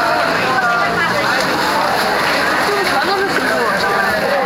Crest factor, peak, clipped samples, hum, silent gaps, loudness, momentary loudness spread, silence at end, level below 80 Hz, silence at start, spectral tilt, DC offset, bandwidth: 12 dB; -2 dBFS; under 0.1%; none; none; -14 LUFS; 1 LU; 0 s; -46 dBFS; 0 s; -3 dB/octave; under 0.1%; 16 kHz